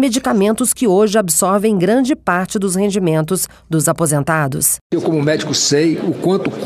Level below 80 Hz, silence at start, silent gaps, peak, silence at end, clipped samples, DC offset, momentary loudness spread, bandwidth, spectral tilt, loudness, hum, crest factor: -48 dBFS; 0 s; 4.81-4.90 s; -2 dBFS; 0 s; under 0.1%; under 0.1%; 5 LU; 16 kHz; -4.5 dB/octave; -15 LUFS; none; 14 dB